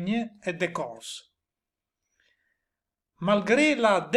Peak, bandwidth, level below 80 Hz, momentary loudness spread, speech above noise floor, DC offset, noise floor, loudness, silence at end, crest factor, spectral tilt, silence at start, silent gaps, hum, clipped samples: -8 dBFS; 12 kHz; -68 dBFS; 18 LU; 64 dB; under 0.1%; -89 dBFS; -25 LUFS; 0 s; 20 dB; -5 dB/octave; 0 s; none; none; under 0.1%